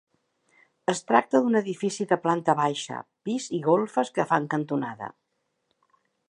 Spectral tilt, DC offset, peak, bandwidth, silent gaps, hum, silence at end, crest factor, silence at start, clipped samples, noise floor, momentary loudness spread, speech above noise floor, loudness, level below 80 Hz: -5 dB/octave; under 0.1%; -4 dBFS; 11 kHz; none; none; 1.2 s; 22 dB; 0.9 s; under 0.1%; -75 dBFS; 11 LU; 50 dB; -26 LUFS; -76 dBFS